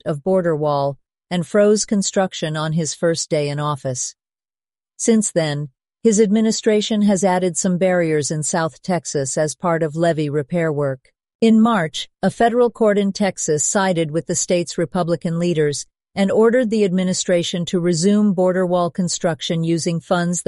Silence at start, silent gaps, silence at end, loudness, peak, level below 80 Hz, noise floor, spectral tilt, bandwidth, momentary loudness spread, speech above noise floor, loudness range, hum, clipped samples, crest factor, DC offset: 0.05 s; 11.35-11.39 s; 0.05 s; -18 LUFS; -4 dBFS; -58 dBFS; under -90 dBFS; -5 dB/octave; 11.5 kHz; 7 LU; over 72 dB; 3 LU; none; under 0.1%; 16 dB; under 0.1%